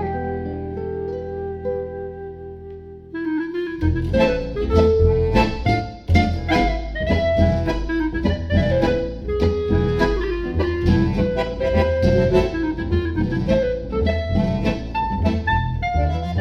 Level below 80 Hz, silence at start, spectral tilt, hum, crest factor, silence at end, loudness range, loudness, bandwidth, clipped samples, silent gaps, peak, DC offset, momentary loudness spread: -28 dBFS; 0 s; -8 dB/octave; none; 18 dB; 0 s; 5 LU; -21 LUFS; 7.2 kHz; under 0.1%; none; -2 dBFS; under 0.1%; 10 LU